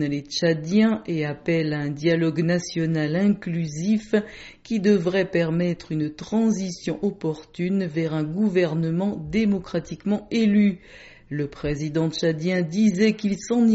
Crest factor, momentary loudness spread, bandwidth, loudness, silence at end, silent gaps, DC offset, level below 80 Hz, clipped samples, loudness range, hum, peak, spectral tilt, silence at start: 16 dB; 8 LU; 8 kHz; -23 LUFS; 0 s; none; under 0.1%; -52 dBFS; under 0.1%; 2 LU; none; -8 dBFS; -6.5 dB/octave; 0 s